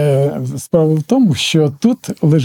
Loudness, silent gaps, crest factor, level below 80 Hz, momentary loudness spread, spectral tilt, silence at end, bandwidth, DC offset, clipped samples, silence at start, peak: -14 LUFS; none; 12 dB; -56 dBFS; 4 LU; -6.5 dB/octave; 0 s; 16.5 kHz; under 0.1%; under 0.1%; 0 s; 0 dBFS